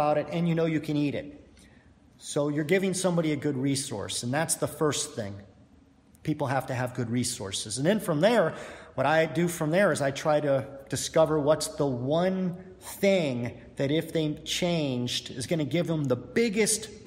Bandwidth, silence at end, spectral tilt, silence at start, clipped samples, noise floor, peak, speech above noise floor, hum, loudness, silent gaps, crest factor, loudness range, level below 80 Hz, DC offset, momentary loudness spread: 16 kHz; 0 s; -4.5 dB/octave; 0 s; under 0.1%; -58 dBFS; -10 dBFS; 31 dB; none; -27 LUFS; none; 18 dB; 5 LU; -60 dBFS; under 0.1%; 10 LU